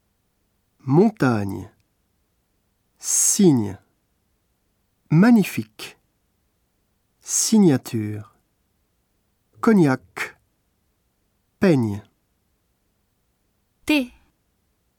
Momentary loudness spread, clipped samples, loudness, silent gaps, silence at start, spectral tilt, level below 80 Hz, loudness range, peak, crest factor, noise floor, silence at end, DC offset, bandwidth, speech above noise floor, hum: 20 LU; under 0.1%; -19 LUFS; none; 0.85 s; -5 dB/octave; -62 dBFS; 7 LU; -4 dBFS; 18 dB; -69 dBFS; 0.9 s; under 0.1%; 18.5 kHz; 51 dB; none